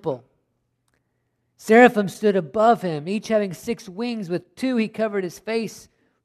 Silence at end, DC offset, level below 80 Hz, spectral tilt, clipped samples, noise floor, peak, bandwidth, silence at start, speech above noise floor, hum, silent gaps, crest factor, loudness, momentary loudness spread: 0.45 s; under 0.1%; -64 dBFS; -6 dB/octave; under 0.1%; -72 dBFS; -2 dBFS; 13.5 kHz; 0.05 s; 51 dB; none; none; 22 dB; -21 LUFS; 16 LU